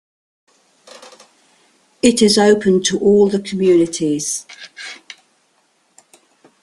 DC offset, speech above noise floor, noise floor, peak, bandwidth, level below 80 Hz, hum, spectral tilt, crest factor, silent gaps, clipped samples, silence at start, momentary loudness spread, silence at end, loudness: under 0.1%; 46 dB; -61 dBFS; 0 dBFS; 12.5 kHz; -54 dBFS; none; -4 dB/octave; 18 dB; none; under 0.1%; 2.05 s; 20 LU; 1.65 s; -14 LUFS